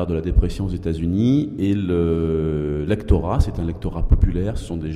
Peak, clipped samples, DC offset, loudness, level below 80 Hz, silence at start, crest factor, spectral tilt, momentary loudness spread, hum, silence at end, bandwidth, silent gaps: -4 dBFS; under 0.1%; under 0.1%; -21 LUFS; -24 dBFS; 0 s; 16 dB; -8.5 dB/octave; 7 LU; none; 0 s; 11.5 kHz; none